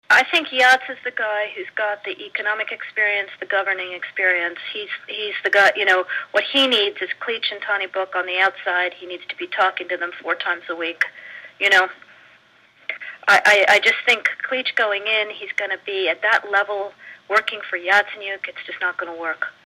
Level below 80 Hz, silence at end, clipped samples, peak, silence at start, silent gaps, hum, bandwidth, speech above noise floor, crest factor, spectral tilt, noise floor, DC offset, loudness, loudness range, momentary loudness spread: -74 dBFS; 0.2 s; under 0.1%; -6 dBFS; 0.1 s; none; none; 16 kHz; 33 dB; 16 dB; -1 dB/octave; -54 dBFS; under 0.1%; -19 LUFS; 5 LU; 13 LU